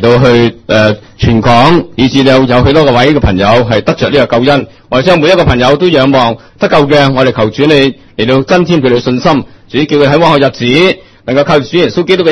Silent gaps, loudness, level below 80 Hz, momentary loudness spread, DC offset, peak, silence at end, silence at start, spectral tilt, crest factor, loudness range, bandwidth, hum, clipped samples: none; -8 LUFS; -30 dBFS; 6 LU; 1%; 0 dBFS; 0 s; 0 s; -6.5 dB/octave; 8 dB; 2 LU; 12 kHz; none; 2%